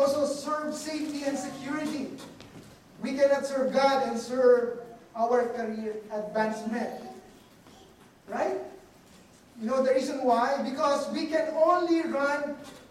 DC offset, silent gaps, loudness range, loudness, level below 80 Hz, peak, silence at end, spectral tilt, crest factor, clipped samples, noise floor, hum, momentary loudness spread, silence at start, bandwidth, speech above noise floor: under 0.1%; none; 8 LU; -28 LUFS; -68 dBFS; -10 dBFS; 0.05 s; -4.5 dB/octave; 18 dB; under 0.1%; -55 dBFS; none; 15 LU; 0 s; 14.5 kHz; 27 dB